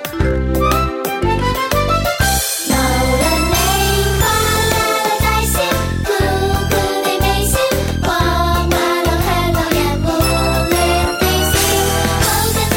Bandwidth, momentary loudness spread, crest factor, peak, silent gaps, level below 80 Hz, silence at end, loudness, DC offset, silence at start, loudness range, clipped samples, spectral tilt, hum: 17 kHz; 3 LU; 14 dB; -2 dBFS; none; -22 dBFS; 0 s; -15 LUFS; under 0.1%; 0 s; 1 LU; under 0.1%; -4 dB/octave; none